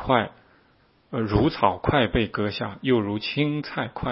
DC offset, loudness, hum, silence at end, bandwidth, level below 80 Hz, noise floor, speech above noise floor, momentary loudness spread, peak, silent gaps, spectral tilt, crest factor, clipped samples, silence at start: under 0.1%; -24 LUFS; none; 0 s; 5.8 kHz; -42 dBFS; -61 dBFS; 37 dB; 8 LU; -4 dBFS; none; -10.5 dB/octave; 22 dB; under 0.1%; 0 s